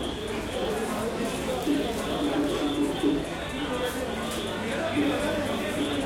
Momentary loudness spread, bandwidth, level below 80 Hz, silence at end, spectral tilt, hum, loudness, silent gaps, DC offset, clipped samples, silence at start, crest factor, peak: 4 LU; 16.5 kHz; -46 dBFS; 0 s; -4.5 dB/octave; none; -28 LUFS; none; under 0.1%; under 0.1%; 0 s; 14 dB; -14 dBFS